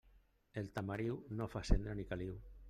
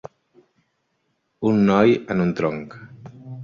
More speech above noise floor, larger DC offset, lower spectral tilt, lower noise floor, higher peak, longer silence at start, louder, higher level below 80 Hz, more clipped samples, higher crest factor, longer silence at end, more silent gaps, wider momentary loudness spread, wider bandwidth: second, 30 dB vs 52 dB; neither; about the same, -7 dB/octave vs -8 dB/octave; about the same, -69 dBFS vs -71 dBFS; second, -16 dBFS vs -2 dBFS; second, 0.55 s vs 1.4 s; second, -43 LUFS vs -19 LUFS; first, -46 dBFS vs -56 dBFS; neither; about the same, 24 dB vs 20 dB; about the same, 0 s vs 0 s; neither; second, 8 LU vs 25 LU; first, 10.5 kHz vs 7 kHz